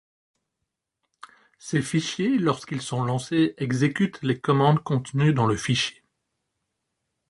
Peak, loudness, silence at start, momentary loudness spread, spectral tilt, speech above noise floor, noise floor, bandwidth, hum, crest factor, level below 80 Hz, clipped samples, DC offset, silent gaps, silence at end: -6 dBFS; -24 LUFS; 1.65 s; 7 LU; -6 dB/octave; 59 dB; -82 dBFS; 11.5 kHz; none; 20 dB; -60 dBFS; under 0.1%; under 0.1%; none; 1.4 s